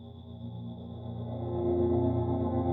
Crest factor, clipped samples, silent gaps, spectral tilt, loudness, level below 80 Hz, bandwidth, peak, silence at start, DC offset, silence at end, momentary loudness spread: 14 dB; under 0.1%; none; -12.5 dB/octave; -32 LUFS; -50 dBFS; 4 kHz; -18 dBFS; 0 s; under 0.1%; 0 s; 15 LU